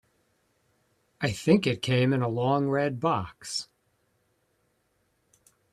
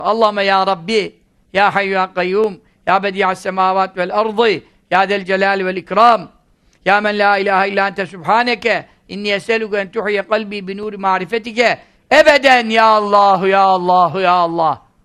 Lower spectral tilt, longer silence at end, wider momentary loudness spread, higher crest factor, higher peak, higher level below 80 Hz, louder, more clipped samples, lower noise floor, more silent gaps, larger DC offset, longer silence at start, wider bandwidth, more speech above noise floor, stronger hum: first, -6 dB/octave vs -4.5 dB/octave; first, 2.1 s vs 0.25 s; about the same, 10 LU vs 10 LU; first, 22 dB vs 14 dB; second, -8 dBFS vs 0 dBFS; second, -64 dBFS vs -54 dBFS; second, -27 LUFS vs -14 LUFS; neither; first, -72 dBFS vs -54 dBFS; neither; neither; first, 1.2 s vs 0 s; about the same, 13.5 kHz vs 13 kHz; first, 46 dB vs 40 dB; neither